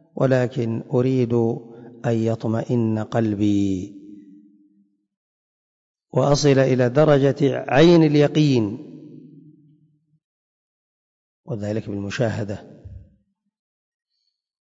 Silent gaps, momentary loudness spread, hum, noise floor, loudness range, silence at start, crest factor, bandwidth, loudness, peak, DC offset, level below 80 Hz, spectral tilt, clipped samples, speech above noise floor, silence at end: 5.17-5.95 s, 10.24-11.43 s; 13 LU; none; -75 dBFS; 13 LU; 0.15 s; 16 dB; 7.8 kHz; -20 LUFS; -4 dBFS; under 0.1%; -54 dBFS; -7 dB/octave; under 0.1%; 56 dB; 1.7 s